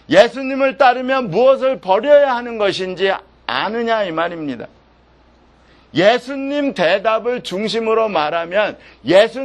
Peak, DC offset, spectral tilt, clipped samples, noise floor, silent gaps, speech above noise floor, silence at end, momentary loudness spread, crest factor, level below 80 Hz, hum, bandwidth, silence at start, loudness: 0 dBFS; under 0.1%; -5 dB/octave; under 0.1%; -51 dBFS; none; 35 dB; 0 s; 10 LU; 16 dB; -54 dBFS; none; 10.5 kHz; 0.1 s; -16 LUFS